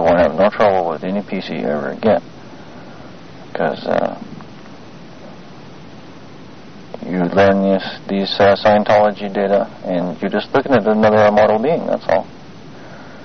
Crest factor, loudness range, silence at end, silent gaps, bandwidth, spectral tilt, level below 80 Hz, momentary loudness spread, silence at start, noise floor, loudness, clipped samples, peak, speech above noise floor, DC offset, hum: 14 dB; 11 LU; 0 s; none; 6.6 kHz; -4.5 dB/octave; -50 dBFS; 25 LU; 0 s; -38 dBFS; -16 LUFS; under 0.1%; -2 dBFS; 23 dB; 1%; none